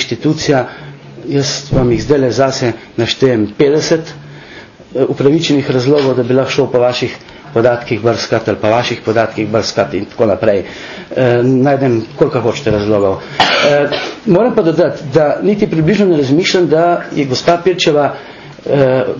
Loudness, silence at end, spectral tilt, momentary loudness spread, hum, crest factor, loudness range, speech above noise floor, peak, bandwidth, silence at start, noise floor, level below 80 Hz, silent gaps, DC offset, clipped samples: -13 LUFS; 0 s; -5.5 dB/octave; 8 LU; none; 12 dB; 3 LU; 23 dB; 0 dBFS; 7.4 kHz; 0 s; -35 dBFS; -40 dBFS; none; under 0.1%; under 0.1%